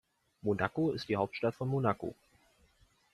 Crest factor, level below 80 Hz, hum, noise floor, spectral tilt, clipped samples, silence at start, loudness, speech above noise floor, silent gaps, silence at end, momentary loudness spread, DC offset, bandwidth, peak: 22 dB; -66 dBFS; none; -68 dBFS; -7.5 dB/octave; under 0.1%; 0.45 s; -34 LUFS; 35 dB; none; 1 s; 8 LU; under 0.1%; 12.5 kHz; -12 dBFS